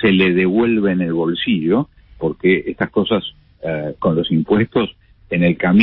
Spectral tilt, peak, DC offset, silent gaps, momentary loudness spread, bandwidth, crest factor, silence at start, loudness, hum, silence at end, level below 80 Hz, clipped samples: -12 dB/octave; 0 dBFS; under 0.1%; none; 10 LU; 4.2 kHz; 16 dB; 0 s; -17 LUFS; none; 0 s; -46 dBFS; under 0.1%